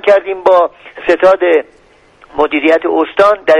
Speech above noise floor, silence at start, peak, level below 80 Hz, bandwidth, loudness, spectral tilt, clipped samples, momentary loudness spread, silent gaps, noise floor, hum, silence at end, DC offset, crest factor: 34 dB; 0.05 s; 0 dBFS; -50 dBFS; 9.6 kHz; -11 LUFS; -5 dB/octave; 0.1%; 7 LU; none; -44 dBFS; none; 0 s; under 0.1%; 12 dB